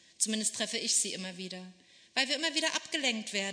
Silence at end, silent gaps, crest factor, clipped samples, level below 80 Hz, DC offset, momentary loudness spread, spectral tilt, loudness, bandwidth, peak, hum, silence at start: 0 s; none; 22 dB; under 0.1%; -86 dBFS; under 0.1%; 12 LU; -1 dB/octave; -30 LUFS; 11 kHz; -12 dBFS; none; 0.2 s